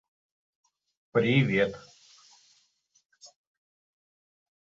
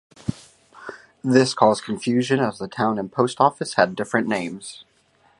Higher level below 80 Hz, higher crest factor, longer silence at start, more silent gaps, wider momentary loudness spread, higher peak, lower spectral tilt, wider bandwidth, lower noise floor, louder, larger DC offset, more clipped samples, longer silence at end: second, -66 dBFS vs -58 dBFS; about the same, 22 dB vs 22 dB; first, 1.15 s vs 0.3 s; neither; second, 9 LU vs 19 LU; second, -12 dBFS vs 0 dBFS; first, -7 dB/octave vs -5 dB/octave; second, 7.8 kHz vs 11.5 kHz; first, -69 dBFS vs -60 dBFS; second, -26 LUFS vs -21 LUFS; neither; neither; first, 1.45 s vs 0.6 s